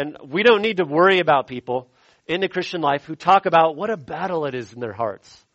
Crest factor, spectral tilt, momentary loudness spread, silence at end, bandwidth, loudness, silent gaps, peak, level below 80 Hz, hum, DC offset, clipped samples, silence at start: 18 dB; -6 dB/octave; 13 LU; 0.4 s; 8.2 kHz; -20 LUFS; none; -2 dBFS; -62 dBFS; none; under 0.1%; under 0.1%; 0 s